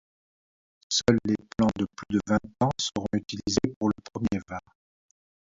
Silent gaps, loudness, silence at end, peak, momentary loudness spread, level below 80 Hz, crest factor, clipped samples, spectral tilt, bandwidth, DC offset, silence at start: 3.76-3.81 s; -28 LUFS; 0.9 s; -6 dBFS; 7 LU; -52 dBFS; 22 dB; under 0.1%; -5 dB/octave; 7.8 kHz; under 0.1%; 0.9 s